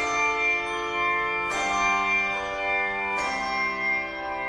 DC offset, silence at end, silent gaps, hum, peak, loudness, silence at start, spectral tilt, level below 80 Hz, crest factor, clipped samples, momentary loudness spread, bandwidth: under 0.1%; 0 s; none; none; -12 dBFS; -24 LUFS; 0 s; -2 dB/octave; -52 dBFS; 14 dB; under 0.1%; 4 LU; 12.5 kHz